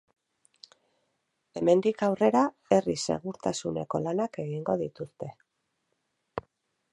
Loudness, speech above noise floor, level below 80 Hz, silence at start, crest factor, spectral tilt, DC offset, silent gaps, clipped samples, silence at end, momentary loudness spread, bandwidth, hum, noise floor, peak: -28 LUFS; 51 dB; -66 dBFS; 1.55 s; 22 dB; -5.5 dB/octave; under 0.1%; none; under 0.1%; 0.55 s; 17 LU; 11.5 kHz; none; -78 dBFS; -8 dBFS